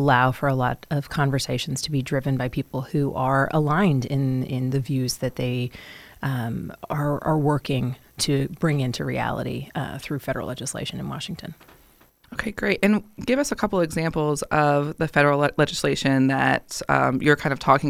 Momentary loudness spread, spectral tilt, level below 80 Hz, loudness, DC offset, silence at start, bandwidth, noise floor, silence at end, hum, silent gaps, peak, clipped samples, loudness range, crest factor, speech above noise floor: 11 LU; -5.5 dB/octave; -48 dBFS; -24 LUFS; under 0.1%; 0 s; 15.5 kHz; -56 dBFS; 0 s; none; none; -2 dBFS; under 0.1%; 6 LU; 20 dB; 33 dB